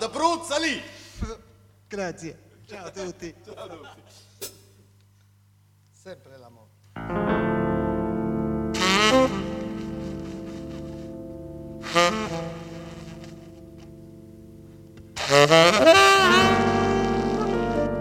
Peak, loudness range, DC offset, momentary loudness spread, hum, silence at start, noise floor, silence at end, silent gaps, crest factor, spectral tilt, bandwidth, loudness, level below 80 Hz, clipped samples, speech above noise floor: -2 dBFS; 22 LU; under 0.1%; 25 LU; 50 Hz at -50 dBFS; 0 s; -58 dBFS; 0 s; none; 24 dB; -4 dB/octave; 17.5 kHz; -21 LUFS; -46 dBFS; under 0.1%; 37 dB